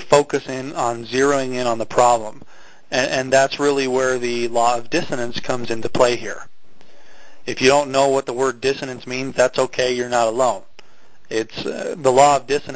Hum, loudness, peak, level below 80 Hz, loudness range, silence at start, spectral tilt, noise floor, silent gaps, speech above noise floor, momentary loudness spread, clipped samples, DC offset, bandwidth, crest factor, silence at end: none; -19 LUFS; 0 dBFS; -52 dBFS; 3 LU; 0 s; -3.5 dB/octave; -53 dBFS; none; 34 dB; 11 LU; under 0.1%; under 0.1%; 8 kHz; 20 dB; 0 s